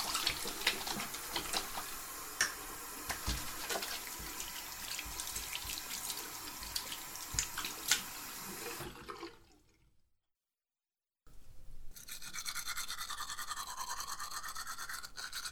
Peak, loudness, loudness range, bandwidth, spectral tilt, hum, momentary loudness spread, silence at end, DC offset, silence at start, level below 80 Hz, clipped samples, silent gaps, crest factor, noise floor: -10 dBFS; -39 LUFS; 11 LU; 17.5 kHz; -0.5 dB/octave; none; 9 LU; 0 s; under 0.1%; 0 s; -56 dBFS; under 0.1%; none; 30 dB; under -90 dBFS